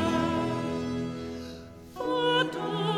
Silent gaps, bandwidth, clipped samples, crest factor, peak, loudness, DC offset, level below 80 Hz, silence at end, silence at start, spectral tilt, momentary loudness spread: none; 15 kHz; under 0.1%; 16 dB; -14 dBFS; -29 LUFS; under 0.1%; -54 dBFS; 0 s; 0 s; -5.5 dB/octave; 16 LU